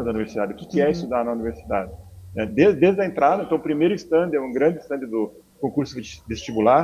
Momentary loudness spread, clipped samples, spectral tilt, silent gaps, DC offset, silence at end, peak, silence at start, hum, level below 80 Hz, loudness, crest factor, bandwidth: 12 LU; under 0.1%; -7 dB/octave; none; under 0.1%; 0 s; -2 dBFS; 0 s; none; -48 dBFS; -22 LUFS; 18 dB; 15 kHz